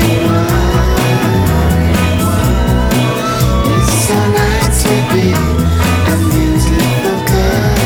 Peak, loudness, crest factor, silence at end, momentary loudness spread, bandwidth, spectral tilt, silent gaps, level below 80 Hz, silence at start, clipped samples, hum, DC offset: 0 dBFS; -12 LUFS; 10 dB; 0 s; 1 LU; over 20 kHz; -5.5 dB/octave; none; -18 dBFS; 0 s; under 0.1%; none; under 0.1%